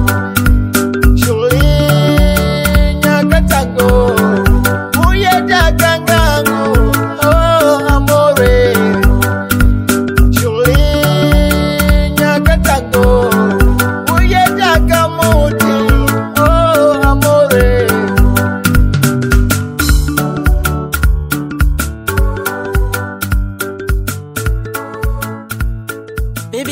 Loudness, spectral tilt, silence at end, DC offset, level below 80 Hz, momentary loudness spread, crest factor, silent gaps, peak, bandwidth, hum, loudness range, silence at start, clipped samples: -11 LUFS; -5.5 dB/octave; 0 s; under 0.1%; -16 dBFS; 9 LU; 10 dB; none; 0 dBFS; 16.5 kHz; none; 7 LU; 0 s; 0.3%